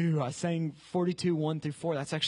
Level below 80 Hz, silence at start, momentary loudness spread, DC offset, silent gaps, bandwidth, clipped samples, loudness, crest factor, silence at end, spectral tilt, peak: -70 dBFS; 0 s; 4 LU; under 0.1%; none; 11 kHz; under 0.1%; -32 LUFS; 14 dB; 0 s; -6 dB/octave; -18 dBFS